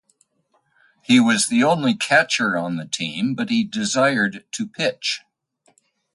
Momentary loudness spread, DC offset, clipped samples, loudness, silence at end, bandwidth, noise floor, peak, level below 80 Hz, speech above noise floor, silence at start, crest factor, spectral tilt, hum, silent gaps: 9 LU; under 0.1%; under 0.1%; -20 LUFS; 0.95 s; 11.5 kHz; -66 dBFS; -2 dBFS; -66 dBFS; 46 dB; 1.1 s; 20 dB; -3.5 dB/octave; none; none